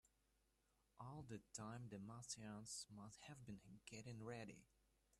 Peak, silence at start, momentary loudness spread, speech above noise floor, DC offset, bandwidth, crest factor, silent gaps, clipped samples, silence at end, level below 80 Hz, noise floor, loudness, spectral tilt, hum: -38 dBFS; 0.05 s; 7 LU; 28 dB; under 0.1%; 13 kHz; 20 dB; none; under 0.1%; 0.05 s; -80 dBFS; -84 dBFS; -56 LUFS; -4 dB/octave; none